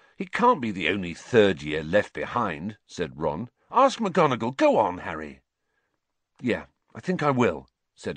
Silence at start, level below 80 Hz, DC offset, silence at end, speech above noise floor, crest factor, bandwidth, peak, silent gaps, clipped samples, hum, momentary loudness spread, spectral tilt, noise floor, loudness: 0.2 s; -56 dBFS; under 0.1%; 0 s; 53 dB; 20 dB; 9.6 kHz; -6 dBFS; none; under 0.1%; none; 15 LU; -6 dB/octave; -78 dBFS; -25 LUFS